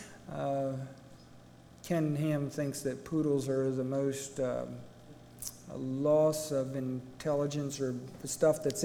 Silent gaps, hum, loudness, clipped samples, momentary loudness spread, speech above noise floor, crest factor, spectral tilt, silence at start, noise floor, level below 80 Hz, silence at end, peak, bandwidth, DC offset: none; 60 Hz at -60 dBFS; -33 LUFS; under 0.1%; 14 LU; 23 dB; 18 dB; -6 dB/octave; 0 s; -55 dBFS; -64 dBFS; 0 s; -14 dBFS; 19 kHz; under 0.1%